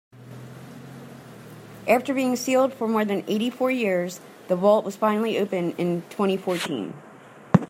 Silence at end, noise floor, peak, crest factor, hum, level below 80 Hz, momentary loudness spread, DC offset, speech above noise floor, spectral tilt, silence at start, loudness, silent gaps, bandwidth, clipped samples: 0.05 s; -46 dBFS; -2 dBFS; 22 dB; none; -68 dBFS; 21 LU; under 0.1%; 23 dB; -6 dB/octave; 0.15 s; -24 LUFS; none; 16 kHz; under 0.1%